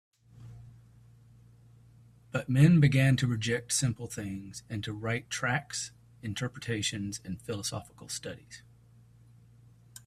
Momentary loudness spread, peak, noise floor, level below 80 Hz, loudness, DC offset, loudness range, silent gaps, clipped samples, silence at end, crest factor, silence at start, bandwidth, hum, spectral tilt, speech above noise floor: 20 LU; -10 dBFS; -58 dBFS; -60 dBFS; -30 LUFS; under 0.1%; 9 LU; none; under 0.1%; 1.45 s; 22 dB; 0.4 s; 13.5 kHz; none; -5 dB/octave; 29 dB